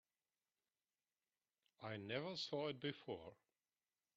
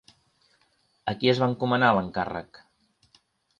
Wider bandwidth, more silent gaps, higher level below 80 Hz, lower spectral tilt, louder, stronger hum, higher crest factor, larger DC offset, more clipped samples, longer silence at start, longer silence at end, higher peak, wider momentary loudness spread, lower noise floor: about the same, 6.8 kHz vs 7.4 kHz; neither; second, -88 dBFS vs -60 dBFS; second, -3.5 dB/octave vs -7 dB/octave; second, -48 LUFS vs -25 LUFS; neither; about the same, 22 dB vs 20 dB; neither; neither; first, 1.8 s vs 1.05 s; second, 0.85 s vs 1.2 s; second, -30 dBFS vs -8 dBFS; second, 10 LU vs 13 LU; first, under -90 dBFS vs -68 dBFS